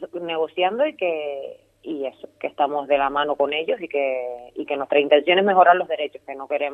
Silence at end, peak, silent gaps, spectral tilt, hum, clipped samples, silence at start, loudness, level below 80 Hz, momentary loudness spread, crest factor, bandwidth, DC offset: 0 s; -2 dBFS; none; -6.5 dB/octave; none; under 0.1%; 0 s; -21 LUFS; -64 dBFS; 16 LU; 20 dB; 3.9 kHz; under 0.1%